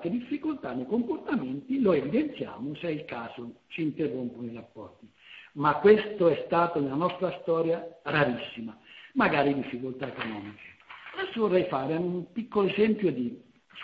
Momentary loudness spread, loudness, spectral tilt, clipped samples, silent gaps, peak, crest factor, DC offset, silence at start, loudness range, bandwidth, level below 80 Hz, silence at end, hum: 19 LU; -28 LUFS; -9 dB/octave; under 0.1%; none; -8 dBFS; 22 dB; under 0.1%; 0 s; 5 LU; 5.2 kHz; -64 dBFS; 0 s; none